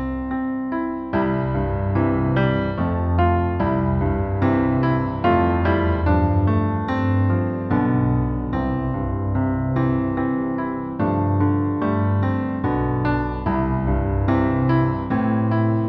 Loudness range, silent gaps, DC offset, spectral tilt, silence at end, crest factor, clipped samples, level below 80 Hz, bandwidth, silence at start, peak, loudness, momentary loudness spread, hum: 2 LU; none; under 0.1%; -11 dB/octave; 0 s; 14 dB; under 0.1%; -32 dBFS; 5 kHz; 0 s; -6 dBFS; -21 LUFS; 5 LU; none